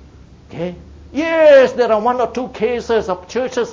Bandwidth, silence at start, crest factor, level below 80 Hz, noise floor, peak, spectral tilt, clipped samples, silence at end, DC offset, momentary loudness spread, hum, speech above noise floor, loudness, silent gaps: 7.6 kHz; 0.5 s; 14 dB; -44 dBFS; -41 dBFS; -2 dBFS; -5 dB/octave; under 0.1%; 0 s; under 0.1%; 18 LU; none; 27 dB; -15 LUFS; none